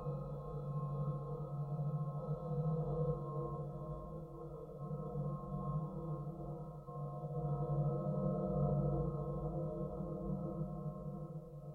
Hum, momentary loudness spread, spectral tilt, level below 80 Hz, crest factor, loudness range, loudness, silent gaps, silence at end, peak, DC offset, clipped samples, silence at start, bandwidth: none; 10 LU; -12 dB/octave; -54 dBFS; 14 dB; 5 LU; -42 LUFS; none; 0 s; -26 dBFS; under 0.1%; under 0.1%; 0 s; 1.5 kHz